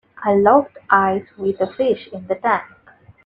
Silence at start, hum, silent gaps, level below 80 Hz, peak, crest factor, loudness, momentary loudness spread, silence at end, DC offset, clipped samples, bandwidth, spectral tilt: 0.2 s; none; none; -58 dBFS; 0 dBFS; 18 dB; -18 LUFS; 10 LU; 0.6 s; under 0.1%; under 0.1%; 5 kHz; -8.5 dB/octave